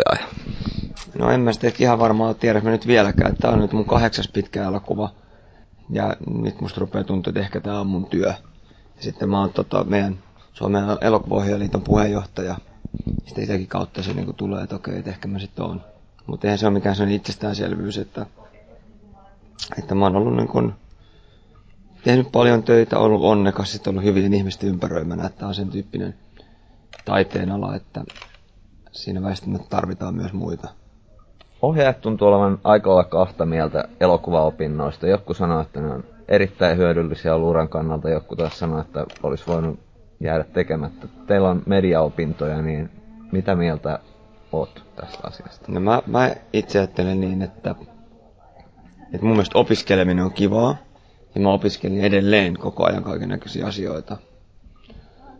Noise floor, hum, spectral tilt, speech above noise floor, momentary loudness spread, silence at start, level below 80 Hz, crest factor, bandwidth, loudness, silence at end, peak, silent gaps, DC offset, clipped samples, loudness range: -50 dBFS; none; -7 dB/octave; 30 dB; 14 LU; 0 s; -40 dBFS; 20 dB; 8 kHz; -21 LUFS; 0.1 s; -2 dBFS; none; under 0.1%; under 0.1%; 8 LU